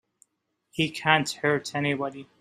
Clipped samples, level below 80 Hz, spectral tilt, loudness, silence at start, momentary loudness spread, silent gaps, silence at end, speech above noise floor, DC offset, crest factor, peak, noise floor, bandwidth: under 0.1%; -68 dBFS; -4.5 dB/octave; -26 LUFS; 0.75 s; 10 LU; none; 0.15 s; 51 dB; under 0.1%; 24 dB; -4 dBFS; -77 dBFS; 15.5 kHz